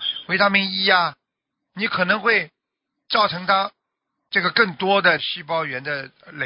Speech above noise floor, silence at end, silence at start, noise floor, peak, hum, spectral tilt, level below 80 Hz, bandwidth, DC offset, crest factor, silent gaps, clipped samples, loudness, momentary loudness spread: 61 dB; 0 s; 0 s; -81 dBFS; -2 dBFS; none; -8 dB/octave; -66 dBFS; 5.6 kHz; under 0.1%; 20 dB; none; under 0.1%; -20 LUFS; 10 LU